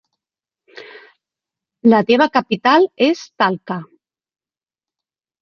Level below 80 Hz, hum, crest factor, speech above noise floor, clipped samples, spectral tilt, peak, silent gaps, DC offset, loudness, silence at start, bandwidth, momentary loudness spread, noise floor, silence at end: -68 dBFS; none; 18 dB; over 75 dB; under 0.1%; -6 dB/octave; -2 dBFS; none; under 0.1%; -15 LUFS; 0.8 s; 7 kHz; 11 LU; under -90 dBFS; 1.55 s